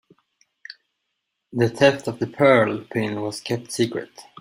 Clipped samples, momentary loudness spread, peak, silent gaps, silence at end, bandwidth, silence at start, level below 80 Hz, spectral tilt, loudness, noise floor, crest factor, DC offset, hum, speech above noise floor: under 0.1%; 23 LU; -2 dBFS; none; 0.2 s; 16 kHz; 0.7 s; -62 dBFS; -5.5 dB/octave; -21 LUFS; -78 dBFS; 20 dB; under 0.1%; none; 57 dB